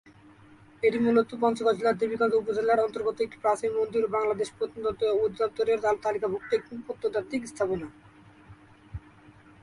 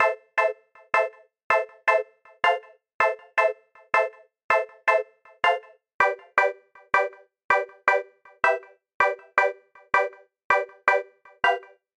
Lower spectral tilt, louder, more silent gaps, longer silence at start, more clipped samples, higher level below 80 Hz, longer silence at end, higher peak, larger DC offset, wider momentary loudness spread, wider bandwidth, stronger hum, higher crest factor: first, -5.5 dB/octave vs -2.5 dB/octave; second, -27 LUFS vs -24 LUFS; second, none vs 1.44-1.50 s, 2.94-2.99 s, 4.44-4.49 s, 5.94-5.99 s, 7.44-7.49 s, 8.94-9.00 s, 10.44-10.50 s; first, 0.8 s vs 0 s; neither; first, -58 dBFS vs -66 dBFS; first, 0.65 s vs 0.4 s; second, -10 dBFS vs -2 dBFS; neither; about the same, 9 LU vs 8 LU; about the same, 11.5 kHz vs 11.5 kHz; neither; about the same, 18 dB vs 22 dB